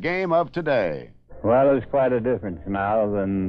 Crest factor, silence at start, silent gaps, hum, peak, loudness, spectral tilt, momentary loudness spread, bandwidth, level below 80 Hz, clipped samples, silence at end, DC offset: 14 dB; 0 s; none; none; -8 dBFS; -22 LUFS; -9 dB/octave; 9 LU; 6 kHz; -48 dBFS; under 0.1%; 0 s; under 0.1%